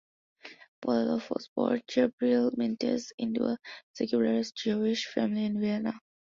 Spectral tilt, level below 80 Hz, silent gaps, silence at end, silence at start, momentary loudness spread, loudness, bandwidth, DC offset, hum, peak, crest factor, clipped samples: -5.5 dB/octave; -72 dBFS; 0.68-0.82 s, 1.48-1.56 s, 2.13-2.18 s, 3.14-3.18 s, 3.83-3.94 s; 0.35 s; 0.45 s; 11 LU; -30 LUFS; 7.6 kHz; under 0.1%; none; -12 dBFS; 16 dB; under 0.1%